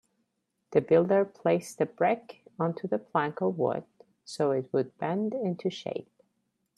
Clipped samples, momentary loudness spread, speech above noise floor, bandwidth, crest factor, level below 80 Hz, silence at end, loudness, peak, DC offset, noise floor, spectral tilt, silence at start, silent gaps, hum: under 0.1%; 12 LU; 51 dB; 13 kHz; 20 dB; -74 dBFS; 0.75 s; -29 LUFS; -10 dBFS; under 0.1%; -79 dBFS; -6.5 dB/octave; 0.7 s; none; none